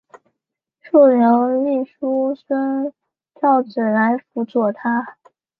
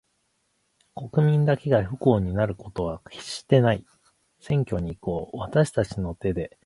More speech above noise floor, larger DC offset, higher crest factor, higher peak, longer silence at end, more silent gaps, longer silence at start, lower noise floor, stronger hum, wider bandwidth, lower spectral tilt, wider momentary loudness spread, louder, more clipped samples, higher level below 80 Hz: first, 65 dB vs 48 dB; neither; about the same, 16 dB vs 20 dB; about the same, -2 dBFS vs -4 dBFS; first, 0.5 s vs 0.2 s; neither; about the same, 0.85 s vs 0.95 s; first, -82 dBFS vs -72 dBFS; neither; second, 5 kHz vs 11.5 kHz; first, -9.5 dB/octave vs -7.5 dB/octave; about the same, 10 LU vs 11 LU; first, -18 LUFS vs -25 LUFS; neither; second, -72 dBFS vs -46 dBFS